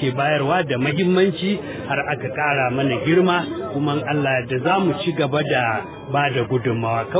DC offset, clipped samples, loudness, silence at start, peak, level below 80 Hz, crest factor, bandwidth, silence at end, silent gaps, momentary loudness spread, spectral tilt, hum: under 0.1%; under 0.1%; -20 LUFS; 0 s; -4 dBFS; -52 dBFS; 16 dB; 4 kHz; 0 s; none; 6 LU; -10.5 dB/octave; none